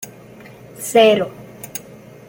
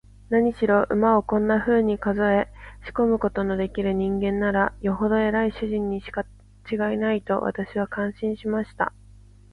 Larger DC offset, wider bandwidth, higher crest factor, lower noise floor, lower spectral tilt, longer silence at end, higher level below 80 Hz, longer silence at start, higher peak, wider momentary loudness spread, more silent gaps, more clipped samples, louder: neither; first, 17 kHz vs 5 kHz; about the same, 18 dB vs 16 dB; second, -41 dBFS vs -49 dBFS; second, -3.5 dB/octave vs -8.5 dB/octave; about the same, 0.5 s vs 0.6 s; second, -60 dBFS vs -46 dBFS; second, 0 s vs 0.3 s; first, -2 dBFS vs -8 dBFS; first, 22 LU vs 8 LU; neither; neither; first, -15 LUFS vs -24 LUFS